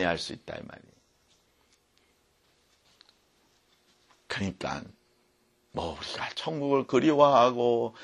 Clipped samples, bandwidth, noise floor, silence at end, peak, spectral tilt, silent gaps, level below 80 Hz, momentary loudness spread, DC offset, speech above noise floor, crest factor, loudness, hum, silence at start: under 0.1%; 11.5 kHz; -69 dBFS; 0 s; -6 dBFS; -5.5 dB/octave; none; -60 dBFS; 20 LU; under 0.1%; 42 dB; 24 dB; -27 LUFS; none; 0 s